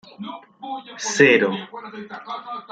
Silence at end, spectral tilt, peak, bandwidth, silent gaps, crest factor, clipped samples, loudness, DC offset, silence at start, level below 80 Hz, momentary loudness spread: 0.1 s; -3.5 dB/octave; -2 dBFS; 9.2 kHz; none; 22 dB; under 0.1%; -18 LUFS; under 0.1%; 0.2 s; -70 dBFS; 21 LU